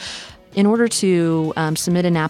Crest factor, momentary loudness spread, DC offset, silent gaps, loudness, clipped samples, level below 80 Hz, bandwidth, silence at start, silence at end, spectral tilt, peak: 14 dB; 11 LU; under 0.1%; none; -18 LUFS; under 0.1%; -54 dBFS; 15.5 kHz; 0 s; 0 s; -5 dB/octave; -6 dBFS